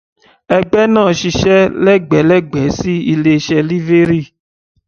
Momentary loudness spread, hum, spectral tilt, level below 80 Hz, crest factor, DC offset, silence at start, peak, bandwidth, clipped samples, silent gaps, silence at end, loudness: 6 LU; none; -6.5 dB/octave; -40 dBFS; 12 dB; under 0.1%; 0.5 s; 0 dBFS; 6.8 kHz; under 0.1%; none; 0.6 s; -12 LUFS